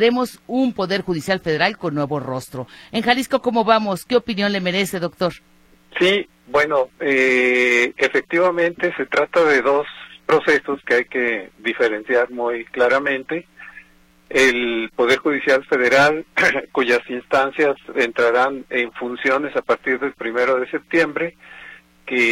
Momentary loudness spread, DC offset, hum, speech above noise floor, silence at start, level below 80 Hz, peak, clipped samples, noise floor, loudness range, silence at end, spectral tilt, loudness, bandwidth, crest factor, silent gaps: 9 LU; under 0.1%; none; 33 dB; 0 s; -56 dBFS; -2 dBFS; under 0.1%; -51 dBFS; 4 LU; 0 s; -4.5 dB/octave; -19 LUFS; 15.5 kHz; 18 dB; none